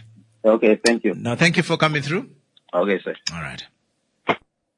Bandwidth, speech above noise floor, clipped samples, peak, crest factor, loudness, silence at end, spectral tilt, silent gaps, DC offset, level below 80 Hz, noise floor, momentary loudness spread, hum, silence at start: 11.5 kHz; 50 dB; under 0.1%; -4 dBFS; 18 dB; -21 LUFS; 0.4 s; -5 dB/octave; none; under 0.1%; -60 dBFS; -70 dBFS; 12 LU; none; 0.45 s